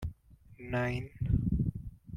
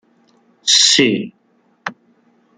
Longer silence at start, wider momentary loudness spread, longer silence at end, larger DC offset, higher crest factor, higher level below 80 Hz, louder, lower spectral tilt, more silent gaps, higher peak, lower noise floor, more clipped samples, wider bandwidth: second, 0 s vs 0.65 s; second, 15 LU vs 21 LU; second, 0 s vs 0.65 s; neither; about the same, 18 dB vs 18 dB; first, -42 dBFS vs -66 dBFS; second, -34 LUFS vs -12 LUFS; first, -8.5 dB/octave vs -1.5 dB/octave; neither; second, -16 dBFS vs 0 dBFS; about the same, -56 dBFS vs -58 dBFS; neither; second, 11 kHz vs 13 kHz